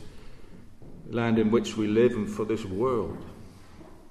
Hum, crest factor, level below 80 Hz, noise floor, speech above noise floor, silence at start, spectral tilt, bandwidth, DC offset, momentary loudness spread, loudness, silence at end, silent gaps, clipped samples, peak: none; 18 dB; -52 dBFS; -47 dBFS; 21 dB; 0 s; -6.5 dB/octave; 12.5 kHz; under 0.1%; 16 LU; -27 LUFS; 0 s; none; under 0.1%; -10 dBFS